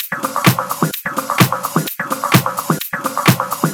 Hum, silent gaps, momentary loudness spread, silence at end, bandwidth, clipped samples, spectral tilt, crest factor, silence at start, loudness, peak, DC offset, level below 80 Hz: none; none; 6 LU; 0 s; over 20 kHz; under 0.1%; -4.5 dB/octave; 16 dB; 0 s; -16 LUFS; 0 dBFS; under 0.1%; -64 dBFS